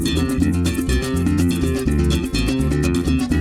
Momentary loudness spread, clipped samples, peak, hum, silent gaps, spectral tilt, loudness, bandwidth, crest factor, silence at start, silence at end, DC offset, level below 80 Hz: 2 LU; under 0.1%; -6 dBFS; none; none; -6 dB/octave; -19 LUFS; 16 kHz; 12 dB; 0 s; 0 s; under 0.1%; -26 dBFS